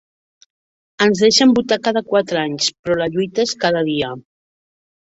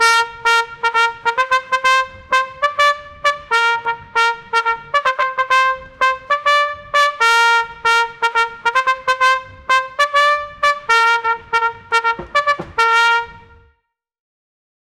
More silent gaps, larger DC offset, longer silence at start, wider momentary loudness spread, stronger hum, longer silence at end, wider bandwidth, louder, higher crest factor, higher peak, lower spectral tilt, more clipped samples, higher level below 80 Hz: first, 2.79-2.83 s vs none; neither; first, 1 s vs 0 s; first, 9 LU vs 6 LU; neither; second, 0.85 s vs 1.6 s; second, 8 kHz vs 16 kHz; about the same, -17 LUFS vs -15 LUFS; about the same, 18 dB vs 16 dB; about the same, -2 dBFS vs -2 dBFS; first, -4 dB/octave vs -0.5 dB/octave; neither; about the same, -56 dBFS vs -52 dBFS